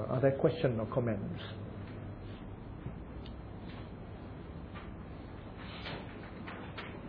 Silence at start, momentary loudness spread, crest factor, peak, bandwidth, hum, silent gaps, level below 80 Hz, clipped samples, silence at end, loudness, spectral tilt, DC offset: 0 s; 16 LU; 24 dB; -14 dBFS; 5.2 kHz; none; none; -52 dBFS; under 0.1%; 0 s; -39 LUFS; -6.5 dB/octave; under 0.1%